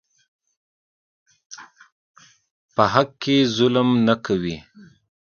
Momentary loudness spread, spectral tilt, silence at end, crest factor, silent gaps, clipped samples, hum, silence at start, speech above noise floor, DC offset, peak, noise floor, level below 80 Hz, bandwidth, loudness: 23 LU; -6 dB/octave; 0.8 s; 24 dB; 1.92-2.14 s, 2.51-2.69 s; under 0.1%; none; 1.5 s; over 71 dB; under 0.1%; 0 dBFS; under -90 dBFS; -56 dBFS; 7 kHz; -20 LUFS